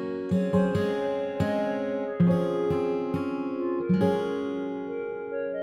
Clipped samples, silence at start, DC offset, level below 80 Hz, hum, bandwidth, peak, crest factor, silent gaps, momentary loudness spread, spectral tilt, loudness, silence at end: under 0.1%; 0 s; under 0.1%; -58 dBFS; none; 11.5 kHz; -12 dBFS; 16 dB; none; 8 LU; -8.5 dB/octave; -27 LUFS; 0 s